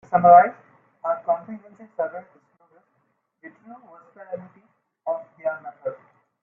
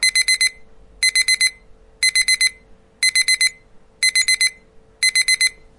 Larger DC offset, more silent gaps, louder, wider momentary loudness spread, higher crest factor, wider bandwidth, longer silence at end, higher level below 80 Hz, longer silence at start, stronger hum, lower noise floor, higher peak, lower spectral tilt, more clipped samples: neither; neither; second, -21 LUFS vs -15 LUFS; first, 27 LU vs 5 LU; first, 22 dB vs 16 dB; second, 2.8 kHz vs 11.5 kHz; first, 0.5 s vs 0.3 s; second, -70 dBFS vs -52 dBFS; about the same, 0.1 s vs 0 s; neither; first, -71 dBFS vs -48 dBFS; about the same, -2 dBFS vs -4 dBFS; first, -10 dB/octave vs 4.5 dB/octave; neither